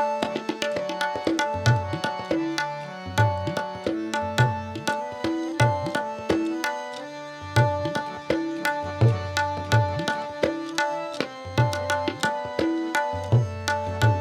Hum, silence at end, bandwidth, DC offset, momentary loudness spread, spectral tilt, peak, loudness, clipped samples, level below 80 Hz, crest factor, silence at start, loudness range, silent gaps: none; 0 s; 15.5 kHz; under 0.1%; 6 LU; -5.5 dB/octave; -4 dBFS; -26 LUFS; under 0.1%; -56 dBFS; 20 dB; 0 s; 1 LU; none